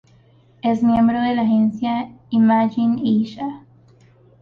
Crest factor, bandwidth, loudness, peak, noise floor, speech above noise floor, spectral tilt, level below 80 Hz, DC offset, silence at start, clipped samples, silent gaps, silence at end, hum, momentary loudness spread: 12 dB; 5.2 kHz; -19 LUFS; -8 dBFS; -52 dBFS; 35 dB; -8.5 dB/octave; -54 dBFS; under 0.1%; 0.65 s; under 0.1%; none; 0.85 s; none; 10 LU